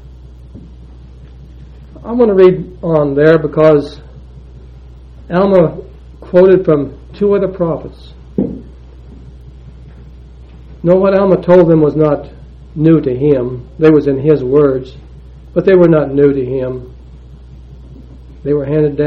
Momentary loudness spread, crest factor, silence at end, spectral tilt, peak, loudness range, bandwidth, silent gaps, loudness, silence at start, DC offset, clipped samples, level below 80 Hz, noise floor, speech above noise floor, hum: 15 LU; 12 dB; 0 s; -10 dB/octave; 0 dBFS; 7 LU; 5.8 kHz; none; -11 LUFS; 0.05 s; under 0.1%; 0.2%; -34 dBFS; -34 dBFS; 24 dB; none